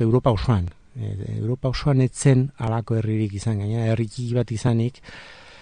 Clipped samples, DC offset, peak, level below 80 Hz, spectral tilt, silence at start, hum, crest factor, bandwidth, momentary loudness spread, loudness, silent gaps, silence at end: under 0.1%; 0.2%; -6 dBFS; -42 dBFS; -7 dB/octave; 0 s; none; 16 dB; 10 kHz; 14 LU; -23 LUFS; none; 0.1 s